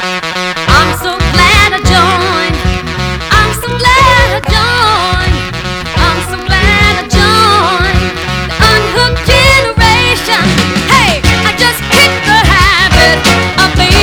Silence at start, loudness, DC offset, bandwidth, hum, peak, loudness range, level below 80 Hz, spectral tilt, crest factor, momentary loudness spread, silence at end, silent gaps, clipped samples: 0 s; -8 LUFS; under 0.1%; over 20 kHz; none; 0 dBFS; 2 LU; -18 dBFS; -4 dB/octave; 8 dB; 9 LU; 0 s; none; 2%